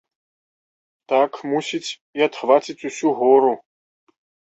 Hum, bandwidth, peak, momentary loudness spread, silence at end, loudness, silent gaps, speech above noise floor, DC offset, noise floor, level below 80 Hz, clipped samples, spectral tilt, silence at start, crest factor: none; 8.2 kHz; -2 dBFS; 13 LU; 0.9 s; -20 LUFS; 2.01-2.13 s; over 71 dB; under 0.1%; under -90 dBFS; -72 dBFS; under 0.1%; -4 dB/octave; 1.1 s; 20 dB